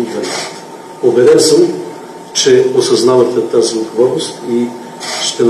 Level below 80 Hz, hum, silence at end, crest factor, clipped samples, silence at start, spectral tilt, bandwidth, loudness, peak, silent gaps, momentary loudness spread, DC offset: -62 dBFS; none; 0 s; 12 dB; 0.1%; 0 s; -3.5 dB/octave; 13 kHz; -12 LUFS; 0 dBFS; none; 16 LU; under 0.1%